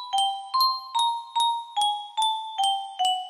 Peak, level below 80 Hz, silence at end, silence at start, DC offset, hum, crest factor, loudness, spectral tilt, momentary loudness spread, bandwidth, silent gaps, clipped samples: -12 dBFS; -80 dBFS; 0 s; 0 s; under 0.1%; none; 14 dB; -25 LUFS; 3 dB/octave; 3 LU; 15.5 kHz; none; under 0.1%